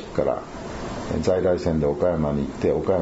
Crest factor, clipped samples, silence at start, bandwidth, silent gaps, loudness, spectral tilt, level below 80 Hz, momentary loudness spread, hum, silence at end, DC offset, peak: 16 dB; under 0.1%; 0 s; 8 kHz; none; -24 LUFS; -7.5 dB/octave; -40 dBFS; 10 LU; none; 0 s; under 0.1%; -6 dBFS